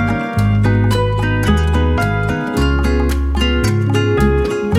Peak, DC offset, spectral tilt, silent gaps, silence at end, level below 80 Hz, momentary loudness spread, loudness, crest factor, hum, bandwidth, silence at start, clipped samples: -2 dBFS; under 0.1%; -7 dB/octave; none; 0 s; -20 dBFS; 3 LU; -15 LUFS; 12 dB; none; 14.5 kHz; 0 s; under 0.1%